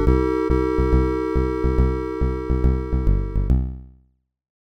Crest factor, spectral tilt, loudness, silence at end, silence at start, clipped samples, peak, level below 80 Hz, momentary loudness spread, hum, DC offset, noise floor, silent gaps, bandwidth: 16 dB; -9.5 dB/octave; -22 LUFS; 0.85 s; 0 s; under 0.1%; -6 dBFS; -22 dBFS; 5 LU; none; under 0.1%; -62 dBFS; none; 6.2 kHz